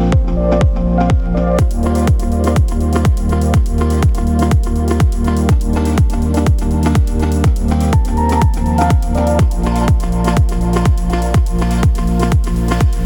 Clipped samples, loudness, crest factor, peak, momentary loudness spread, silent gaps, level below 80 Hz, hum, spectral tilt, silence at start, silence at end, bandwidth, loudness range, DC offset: under 0.1%; -15 LUFS; 12 dB; 0 dBFS; 2 LU; none; -16 dBFS; none; -7.5 dB/octave; 0 s; 0 s; 18.5 kHz; 1 LU; under 0.1%